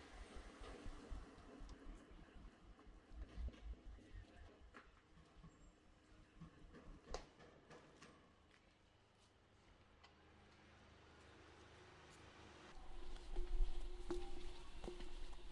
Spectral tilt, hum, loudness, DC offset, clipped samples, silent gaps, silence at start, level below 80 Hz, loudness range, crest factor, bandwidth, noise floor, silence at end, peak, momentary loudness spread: -5.5 dB/octave; none; -58 LUFS; under 0.1%; under 0.1%; none; 0 s; -54 dBFS; 13 LU; 24 dB; 11 kHz; -73 dBFS; 0 s; -28 dBFS; 16 LU